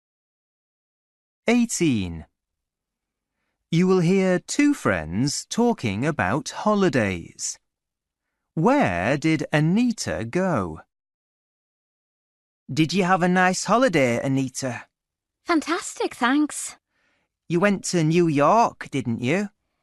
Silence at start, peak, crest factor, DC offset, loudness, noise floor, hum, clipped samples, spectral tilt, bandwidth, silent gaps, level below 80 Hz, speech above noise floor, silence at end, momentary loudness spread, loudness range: 1.45 s; -6 dBFS; 18 dB; under 0.1%; -22 LUFS; -85 dBFS; none; under 0.1%; -5.5 dB/octave; 12 kHz; 11.14-12.66 s; -56 dBFS; 64 dB; 0.35 s; 11 LU; 5 LU